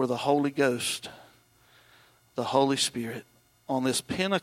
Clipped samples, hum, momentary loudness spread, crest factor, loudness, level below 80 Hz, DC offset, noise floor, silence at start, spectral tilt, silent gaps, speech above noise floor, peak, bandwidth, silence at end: under 0.1%; none; 13 LU; 20 dB; -28 LUFS; -68 dBFS; under 0.1%; -61 dBFS; 0 s; -3.5 dB/octave; none; 33 dB; -10 dBFS; 16.5 kHz; 0 s